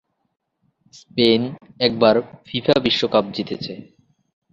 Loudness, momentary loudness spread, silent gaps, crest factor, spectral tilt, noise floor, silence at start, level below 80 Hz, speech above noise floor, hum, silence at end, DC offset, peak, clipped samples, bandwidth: -19 LUFS; 13 LU; none; 20 dB; -6 dB/octave; -63 dBFS; 0.95 s; -56 dBFS; 44 dB; none; 0.7 s; under 0.1%; 0 dBFS; under 0.1%; 7.8 kHz